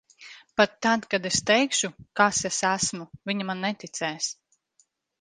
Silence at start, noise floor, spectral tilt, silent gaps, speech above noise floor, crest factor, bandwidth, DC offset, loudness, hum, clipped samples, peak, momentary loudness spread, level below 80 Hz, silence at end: 0.2 s; -68 dBFS; -2.5 dB/octave; none; 42 dB; 24 dB; 10 kHz; under 0.1%; -25 LUFS; none; under 0.1%; -4 dBFS; 10 LU; -62 dBFS; 0.9 s